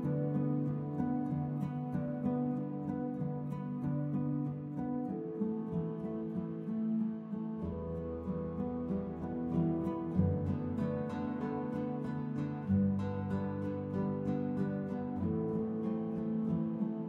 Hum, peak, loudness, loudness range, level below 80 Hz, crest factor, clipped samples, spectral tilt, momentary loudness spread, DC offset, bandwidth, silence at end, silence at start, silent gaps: none; -18 dBFS; -36 LUFS; 2 LU; -60 dBFS; 18 dB; under 0.1%; -11 dB/octave; 6 LU; under 0.1%; 5 kHz; 0 s; 0 s; none